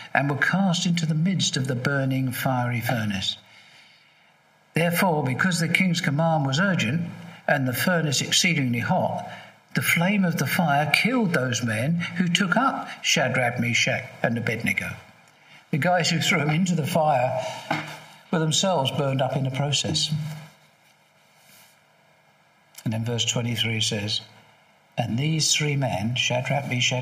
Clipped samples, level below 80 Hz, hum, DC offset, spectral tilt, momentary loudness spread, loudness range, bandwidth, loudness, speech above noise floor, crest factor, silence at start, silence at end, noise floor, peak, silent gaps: under 0.1%; -66 dBFS; none; under 0.1%; -4 dB/octave; 9 LU; 5 LU; 15.5 kHz; -23 LUFS; 36 dB; 24 dB; 0 s; 0 s; -59 dBFS; -2 dBFS; none